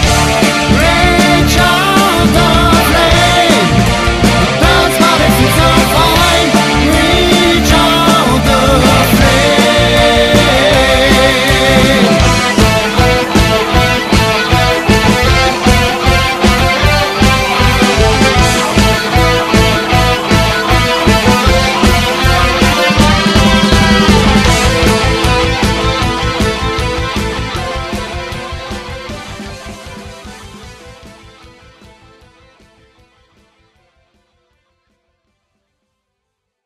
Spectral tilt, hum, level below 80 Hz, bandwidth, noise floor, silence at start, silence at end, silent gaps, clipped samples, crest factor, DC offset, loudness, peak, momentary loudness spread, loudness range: -4.5 dB/octave; none; -20 dBFS; 16 kHz; -73 dBFS; 0 s; 5.55 s; none; under 0.1%; 10 dB; under 0.1%; -9 LUFS; 0 dBFS; 8 LU; 9 LU